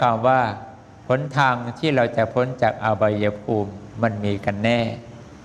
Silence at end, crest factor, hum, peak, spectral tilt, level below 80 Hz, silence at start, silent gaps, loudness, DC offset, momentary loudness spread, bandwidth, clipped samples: 0 s; 18 dB; none; -4 dBFS; -7 dB/octave; -54 dBFS; 0 s; none; -22 LUFS; under 0.1%; 13 LU; 10 kHz; under 0.1%